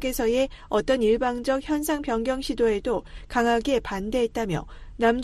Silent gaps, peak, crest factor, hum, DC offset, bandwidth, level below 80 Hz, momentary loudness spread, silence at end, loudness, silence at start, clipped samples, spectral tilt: none; -8 dBFS; 16 dB; none; under 0.1%; 13 kHz; -42 dBFS; 7 LU; 0 s; -25 LUFS; 0 s; under 0.1%; -4.5 dB/octave